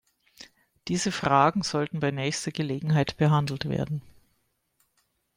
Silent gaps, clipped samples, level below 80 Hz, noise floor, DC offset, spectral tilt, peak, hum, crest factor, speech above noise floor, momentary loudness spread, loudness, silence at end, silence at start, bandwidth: none; under 0.1%; -58 dBFS; -73 dBFS; under 0.1%; -5.5 dB/octave; -6 dBFS; none; 22 dB; 48 dB; 10 LU; -26 LUFS; 1.25 s; 0.4 s; 14.5 kHz